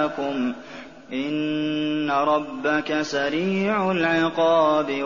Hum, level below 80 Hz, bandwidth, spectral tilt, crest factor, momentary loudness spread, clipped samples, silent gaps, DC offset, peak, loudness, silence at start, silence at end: none; -62 dBFS; 7.2 kHz; -3.5 dB/octave; 14 dB; 10 LU; under 0.1%; none; 0.2%; -8 dBFS; -23 LUFS; 0 s; 0 s